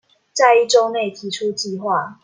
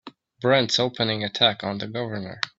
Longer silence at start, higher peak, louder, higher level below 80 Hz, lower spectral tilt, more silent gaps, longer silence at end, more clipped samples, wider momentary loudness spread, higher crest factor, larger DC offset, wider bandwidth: first, 0.35 s vs 0.05 s; about the same, -2 dBFS vs -2 dBFS; first, -17 LUFS vs -23 LUFS; second, -72 dBFS vs -62 dBFS; second, -2.5 dB/octave vs -4 dB/octave; neither; about the same, 0.1 s vs 0.1 s; neither; about the same, 11 LU vs 10 LU; second, 16 dB vs 22 dB; neither; first, 9.8 kHz vs 8 kHz